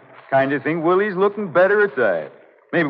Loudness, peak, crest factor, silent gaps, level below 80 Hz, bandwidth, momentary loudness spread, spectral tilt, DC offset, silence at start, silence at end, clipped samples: -19 LUFS; -4 dBFS; 16 dB; none; -72 dBFS; 5.2 kHz; 7 LU; -9 dB/octave; under 0.1%; 0.3 s; 0 s; under 0.1%